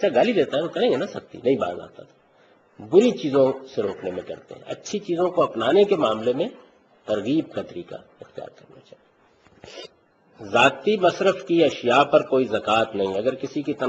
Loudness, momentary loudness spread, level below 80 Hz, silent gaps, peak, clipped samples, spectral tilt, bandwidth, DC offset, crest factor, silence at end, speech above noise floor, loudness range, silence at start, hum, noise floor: -22 LUFS; 21 LU; -64 dBFS; none; -2 dBFS; under 0.1%; -5.5 dB/octave; 8.2 kHz; under 0.1%; 20 dB; 0 s; 36 dB; 11 LU; 0 s; none; -58 dBFS